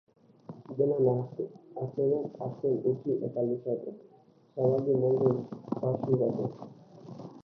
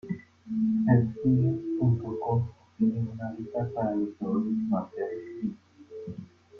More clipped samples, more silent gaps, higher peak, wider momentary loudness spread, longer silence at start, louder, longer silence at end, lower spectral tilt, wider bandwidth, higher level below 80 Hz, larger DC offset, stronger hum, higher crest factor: neither; neither; about the same, -10 dBFS vs -10 dBFS; first, 19 LU vs 15 LU; first, 0.5 s vs 0.05 s; about the same, -30 LUFS vs -29 LUFS; about the same, 0.05 s vs 0 s; about the same, -12 dB/octave vs -11.5 dB/octave; first, 5.8 kHz vs 3.7 kHz; second, -72 dBFS vs -60 dBFS; neither; neither; about the same, 20 dB vs 20 dB